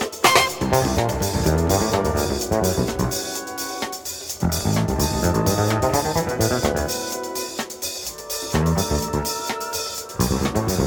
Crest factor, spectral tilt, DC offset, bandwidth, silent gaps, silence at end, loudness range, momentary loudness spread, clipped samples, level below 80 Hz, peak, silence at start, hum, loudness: 20 dB; -4 dB/octave; under 0.1%; 19.5 kHz; none; 0 s; 3 LU; 8 LU; under 0.1%; -34 dBFS; 0 dBFS; 0 s; none; -22 LUFS